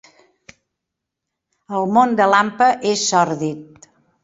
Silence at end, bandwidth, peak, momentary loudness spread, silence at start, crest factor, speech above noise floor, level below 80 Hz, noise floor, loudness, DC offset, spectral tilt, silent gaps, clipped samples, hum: 0.6 s; 8 kHz; -2 dBFS; 12 LU; 1.7 s; 18 dB; 65 dB; -64 dBFS; -81 dBFS; -17 LUFS; under 0.1%; -3.5 dB/octave; none; under 0.1%; none